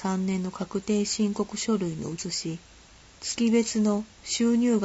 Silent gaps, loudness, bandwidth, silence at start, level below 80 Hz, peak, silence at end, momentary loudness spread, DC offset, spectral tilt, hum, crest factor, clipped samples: none; -27 LUFS; 8.2 kHz; 0 s; -58 dBFS; -12 dBFS; 0 s; 10 LU; under 0.1%; -4.5 dB/octave; none; 14 dB; under 0.1%